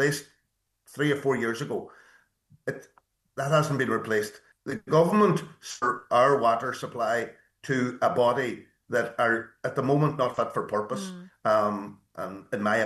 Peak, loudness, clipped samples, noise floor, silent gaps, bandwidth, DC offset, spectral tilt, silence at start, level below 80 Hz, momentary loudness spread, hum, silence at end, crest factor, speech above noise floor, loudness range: -8 dBFS; -27 LUFS; under 0.1%; -76 dBFS; none; 12.5 kHz; under 0.1%; -5.5 dB/octave; 0 s; -68 dBFS; 15 LU; none; 0 s; 18 dB; 50 dB; 5 LU